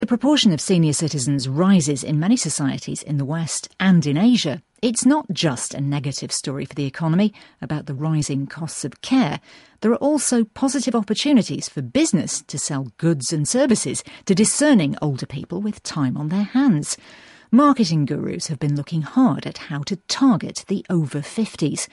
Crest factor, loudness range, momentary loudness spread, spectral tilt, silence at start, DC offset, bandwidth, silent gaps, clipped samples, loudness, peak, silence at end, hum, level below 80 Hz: 16 dB; 3 LU; 11 LU; -5 dB/octave; 0 s; under 0.1%; 11.5 kHz; none; under 0.1%; -20 LUFS; -4 dBFS; 0.05 s; none; -58 dBFS